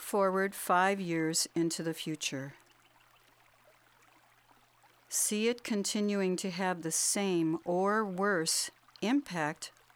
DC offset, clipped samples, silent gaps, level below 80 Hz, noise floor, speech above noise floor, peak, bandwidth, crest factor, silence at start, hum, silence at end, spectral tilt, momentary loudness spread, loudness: under 0.1%; under 0.1%; none; -78 dBFS; -65 dBFS; 33 dB; -14 dBFS; 19.5 kHz; 18 dB; 0 s; none; 0.25 s; -3.5 dB/octave; 8 LU; -31 LUFS